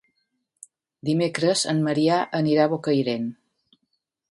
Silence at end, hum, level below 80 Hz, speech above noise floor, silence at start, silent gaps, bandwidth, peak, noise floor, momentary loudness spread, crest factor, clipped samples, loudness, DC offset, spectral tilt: 0.95 s; none; -70 dBFS; 54 dB; 1.05 s; none; 11.5 kHz; -6 dBFS; -76 dBFS; 8 LU; 18 dB; under 0.1%; -23 LUFS; under 0.1%; -5 dB/octave